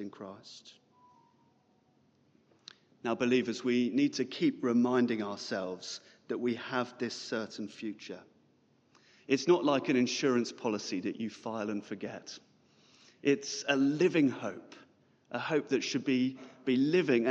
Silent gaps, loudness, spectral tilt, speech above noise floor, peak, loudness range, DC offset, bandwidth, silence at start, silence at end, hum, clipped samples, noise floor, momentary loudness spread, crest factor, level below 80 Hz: none; -32 LUFS; -5 dB/octave; 38 dB; -14 dBFS; 6 LU; under 0.1%; 8 kHz; 0 s; 0 s; none; under 0.1%; -69 dBFS; 17 LU; 20 dB; -84 dBFS